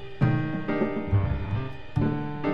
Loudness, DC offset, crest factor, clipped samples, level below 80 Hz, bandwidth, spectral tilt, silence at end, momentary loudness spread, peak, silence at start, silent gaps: -28 LUFS; 1%; 18 dB; under 0.1%; -38 dBFS; 5.8 kHz; -10 dB/octave; 0 s; 6 LU; -8 dBFS; 0 s; none